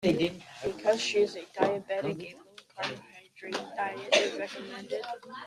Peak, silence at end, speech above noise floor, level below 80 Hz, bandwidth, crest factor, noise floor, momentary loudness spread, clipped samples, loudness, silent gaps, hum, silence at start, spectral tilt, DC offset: -8 dBFS; 0 s; 19 dB; -66 dBFS; 13 kHz; 24 dB; -50 dBFS; 15 LU; under 0.1%; -31 LUFS; none; none; 0 s; -4 dB/octave; under 0.1%